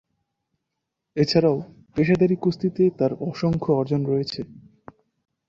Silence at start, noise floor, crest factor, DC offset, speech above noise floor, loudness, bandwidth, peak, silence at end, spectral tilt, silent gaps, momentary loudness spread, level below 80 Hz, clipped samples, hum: 1.15 s; -81 dBFS; 18 dB; under 0.1%; 60 dB; -22 LUFS; 7.6 kHz; -6 dBFS; 0.9 s; -7.5 dB/octave; none; 12 LU; -56 dBFS; under 0.1%; none